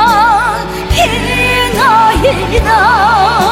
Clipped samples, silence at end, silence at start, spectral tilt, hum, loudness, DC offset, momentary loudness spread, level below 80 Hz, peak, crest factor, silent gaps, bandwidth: under 0.1%; 0 s; 0 s; -4 dB/octave; none; -9 LUFS; under 0.1%; 5 LU; -22 dBFS; 0 dBFS; 10 dB; none; 16.5 kHz